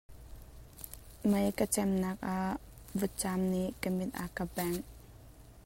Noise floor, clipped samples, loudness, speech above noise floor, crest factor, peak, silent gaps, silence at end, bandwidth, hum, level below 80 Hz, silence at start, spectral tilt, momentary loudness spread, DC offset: -54 dBFS; under 0.1%; -34 LUFS; 21 dB; 20 dB; -16 dBFS; none; 0.05 s; 16.5 kHz; none; -54 dBFS; 0.1 s; -5.5 dB/octave; 23 LU; under 0.1%